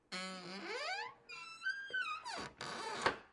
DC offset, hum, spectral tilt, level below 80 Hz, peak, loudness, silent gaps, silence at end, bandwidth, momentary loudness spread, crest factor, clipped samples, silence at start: under 0.1%; none; -2.5 dB/octave; -76 dBFS; -16 dBFS; -42 LUFS; none; 0 s; 11.5 kHz; 9 LU; 28 dB; under 0.1%; 0.1 s